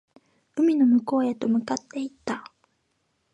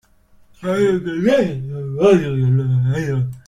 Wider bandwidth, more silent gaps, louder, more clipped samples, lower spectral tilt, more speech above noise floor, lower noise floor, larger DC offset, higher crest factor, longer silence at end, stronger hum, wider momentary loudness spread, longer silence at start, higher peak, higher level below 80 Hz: second, 8.4 kHz vs 10 kHz; neither; second, -24 LUFS vs -18 LUFS; neither; second, -5.5 dB/octave vs -8 dB/octave; first, 50 dB vs 34 dB; first, -73 dBFS vs -50 dBFS; neither; about the same, 14 dB vs 16 dB; first, 0.9 s vs 0.05 s; neither; first, 14 LU vs 10 LU; about the same, 0.55 s vs 0.6 s; second, -12 dBFS vs -2 dBFS; second, -72 dBFS vs -48 dBFS